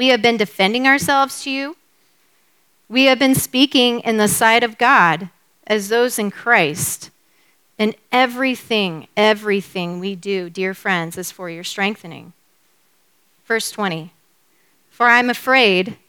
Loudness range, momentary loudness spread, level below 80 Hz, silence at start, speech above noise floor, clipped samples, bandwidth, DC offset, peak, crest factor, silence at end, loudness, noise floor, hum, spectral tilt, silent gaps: 10 LU; 13 LU; -60 dBFS; 0 s; 44 dB; under 0.1%; 19.5 kHz; under 0.1%; 0 dBFS; 18 dB; 0.15 s; -16 LUFS; -61 dBFS; none; -3 dB/octave; none